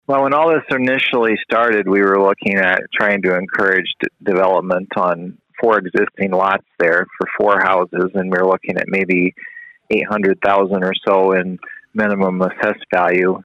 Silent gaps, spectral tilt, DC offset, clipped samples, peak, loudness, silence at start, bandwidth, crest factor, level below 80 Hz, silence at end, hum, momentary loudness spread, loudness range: none; -7 dB/octave; under 0.1%; under 0.1%; -2 dBFS; -16 LUFS; 0.1 s; 8 kHz; 14 dB; -60 dBFS; 0.05 s; none; 6 LU; 2 LU